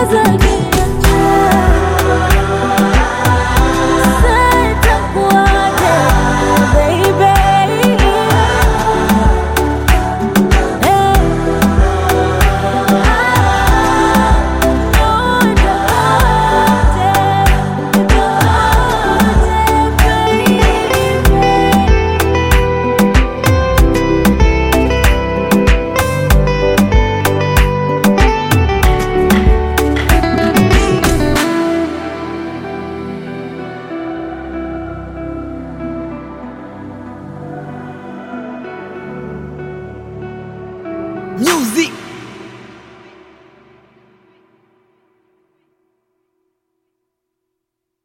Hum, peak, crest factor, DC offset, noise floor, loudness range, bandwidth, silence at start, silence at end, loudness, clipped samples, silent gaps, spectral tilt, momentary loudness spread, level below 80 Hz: none; 0 dBFS; 12 dB; under 0.1%; -76 dBFS; 15 LU; 17 kHz; 0 s; 5.35 s; -12 LUFS; under 0.1%; none; -5.5 dB/octave; 16 LU; -18 dBFS